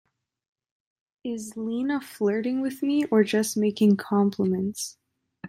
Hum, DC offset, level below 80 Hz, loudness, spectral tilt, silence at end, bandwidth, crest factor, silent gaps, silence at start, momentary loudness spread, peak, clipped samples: none; under 0.1%; -72 dBFS; -25 LUFS; -5.5 dB/octave; 0 s; 15 kHz; 18 dB; none; 1.25 s; 12 LU; -8 dBFS; under 0.1%